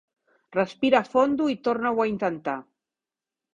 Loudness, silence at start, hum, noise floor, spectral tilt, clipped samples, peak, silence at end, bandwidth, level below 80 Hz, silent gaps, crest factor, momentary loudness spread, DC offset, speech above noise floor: -24 LUFS; 0.5 s; none; -90 dBFS; -6 dB/octave; under 0.1%; -6 dBFS; 0.95 s; 7.6 kHz; -66 dBFS; none; 20 dB; 10 LU; under 0.1%; 66 dB